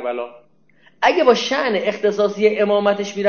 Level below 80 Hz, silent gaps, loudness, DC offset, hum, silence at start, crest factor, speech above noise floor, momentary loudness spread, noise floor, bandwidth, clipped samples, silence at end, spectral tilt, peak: -62 dBFS; none; -17 LUFS; 0.2%; none; 0 s; 16 dB; 38 dB; 9 LU; -56 dBFS; 7 kHz; under 0.1%; 0 s; -4.5 dB/octave; -2 dBFS